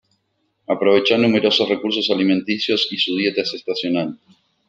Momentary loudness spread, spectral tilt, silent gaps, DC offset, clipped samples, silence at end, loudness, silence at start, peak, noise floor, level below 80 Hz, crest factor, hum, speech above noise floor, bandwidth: 8 LU; -5 dB/octave; none; under 0.1%; under 0.1%; 0.55 s; -18 LUFS; 0.7 s; -2 dBFS; -69 dBFS; -66 dBFS; 18 dB; none; 51 dB; 8.8 kHz